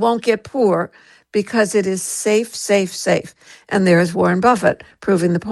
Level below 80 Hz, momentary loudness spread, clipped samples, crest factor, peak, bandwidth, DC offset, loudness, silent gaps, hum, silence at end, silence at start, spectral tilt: -56 dBFS; 8 LU; under 0.1%; 16 dB; -2 dBFS; 12.5 kHz; under 0.1%; -17 LUFS; none; none; 0 s; 0 s; -5 dB/octave